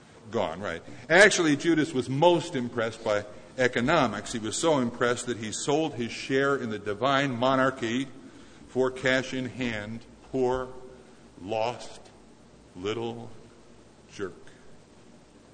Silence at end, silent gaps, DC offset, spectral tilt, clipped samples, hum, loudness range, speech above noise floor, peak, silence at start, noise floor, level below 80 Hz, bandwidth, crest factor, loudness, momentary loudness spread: 0.35 s; none; under 0.1%; -4 dB/octave; under 0.1%; none; 13 LU; 27 dB; -4 dBFS; 0.25 s; -54 dBFS; -58 dBFS; 9.6 kHz; 24 dB; -27 LUFS; 16 LU